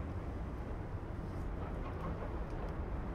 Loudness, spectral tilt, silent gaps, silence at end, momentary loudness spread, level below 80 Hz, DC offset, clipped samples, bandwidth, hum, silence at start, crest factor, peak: -43 LUFS; -8.5 dB/octave; none; 0 s; 2 LU; -44 dBFS; under 0.1%; under 0.1%; 10 kHz; none; 0 s; 12 dB; -28 dBFS